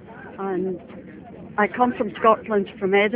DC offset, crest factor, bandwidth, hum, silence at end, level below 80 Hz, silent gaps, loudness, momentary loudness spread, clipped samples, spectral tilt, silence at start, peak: under 0.1%; 20 dB; 4 kHz; none; 0 s; -58 dBFS; none; -22 LUFS; 21 LU; under 0.1%; -9.5 dB/octave; 0 s; -2 dBFS